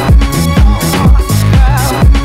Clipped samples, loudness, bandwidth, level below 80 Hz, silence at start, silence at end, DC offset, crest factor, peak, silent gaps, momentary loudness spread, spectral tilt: 4%; -9 LUFS; 16 kHz; -10 dBFS; 0 s; 0 s; under 0.1%; 6 dB; 0 dBFS; none; 1 LU; -5.5 dB/octave